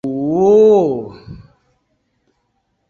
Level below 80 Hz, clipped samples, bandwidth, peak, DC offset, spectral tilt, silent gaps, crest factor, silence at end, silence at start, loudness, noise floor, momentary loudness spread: -52 dBFS; under 0.1%; 7 kHz; -2 dBFS; under 0.1%; -8.5 dB/octave; none; 14 dB; 1.5 s; 0.05 s; -12 LUFS; -67 dBFS; 16 LU